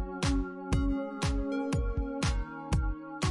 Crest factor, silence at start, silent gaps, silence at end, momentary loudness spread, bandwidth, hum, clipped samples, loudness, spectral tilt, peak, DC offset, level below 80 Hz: 14 dB; 0 s; none; 0 s; 3 LU; 11.5 kHz; none; under 0.1%; -33 LUFS; -6 dB/octave; -16 dBFS; under 0.1%; -34 dBFS